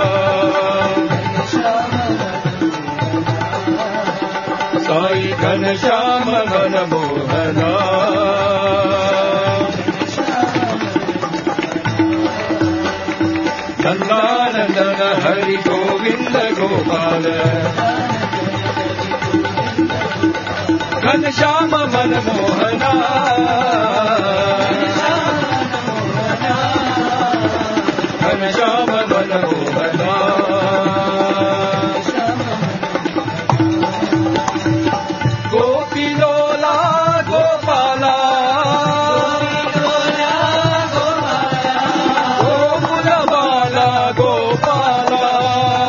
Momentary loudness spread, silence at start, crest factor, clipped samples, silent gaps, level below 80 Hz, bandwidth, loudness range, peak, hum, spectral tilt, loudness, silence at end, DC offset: 5 LU; 0 s; 16 dB; under 0.1%; none; -50 dBFS; 7.2 kHz; 3 LU; 0 dBFS; none; -5.5 dB/octave; -16 LUFS; 0 s; under 0.1%